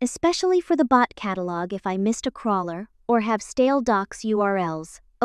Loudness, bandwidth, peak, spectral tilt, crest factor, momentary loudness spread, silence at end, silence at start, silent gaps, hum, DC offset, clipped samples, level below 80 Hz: -23 LUFS; 12.5 kHz; -4 dBFS; -5 dB/octave; 18 dB; 9 LU; 0 s; 0 s; none; none; under 0.1%; under 0.1%; -56 dBFS